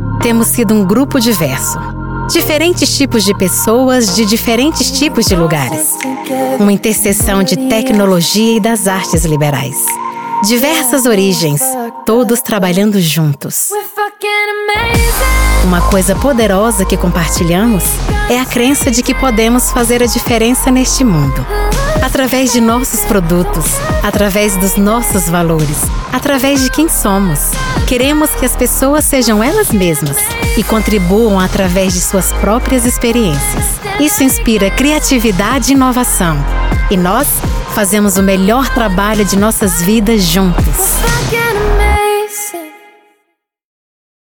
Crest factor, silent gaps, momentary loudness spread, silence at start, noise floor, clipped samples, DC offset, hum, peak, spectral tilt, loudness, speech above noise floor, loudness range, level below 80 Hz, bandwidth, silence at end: 10 dB; none; 4 LU; 0 s; -64 dBFS; under 0.1%; under 0.1%; none; 0 dBFS; -4 dB/octave; -11 LUFS; 53 dB; 1 LU; -20 dBFS; 19.5 kHz; 1.55 s